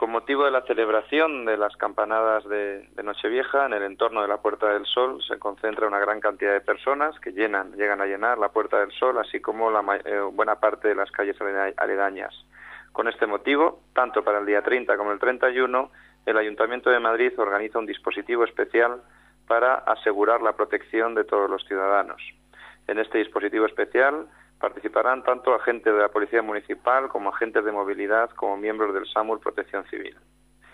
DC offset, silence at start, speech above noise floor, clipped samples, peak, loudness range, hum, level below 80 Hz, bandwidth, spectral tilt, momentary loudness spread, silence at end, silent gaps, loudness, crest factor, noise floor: under 0.1%; 0 s; 26 dB; under 0.1%; -6 dBFS; 2 LU; none; -64 dBFS; 10.5 kHz; -5 dB/octave; 8 LU; 0.65 s; none; -24 LUFS; 18 dB; -50 dBFS